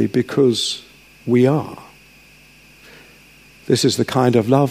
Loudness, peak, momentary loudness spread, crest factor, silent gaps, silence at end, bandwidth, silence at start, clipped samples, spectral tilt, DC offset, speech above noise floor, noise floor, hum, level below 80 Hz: -17 LUFS; -2 dBFS; 15 LU; 18 dB; none; 0 s; 15.5 kHz; 0 s; under 0.1%; -5.5 dB/octave; under 0.1%; 31 dB; -47 dBFS; none; -58 dBFS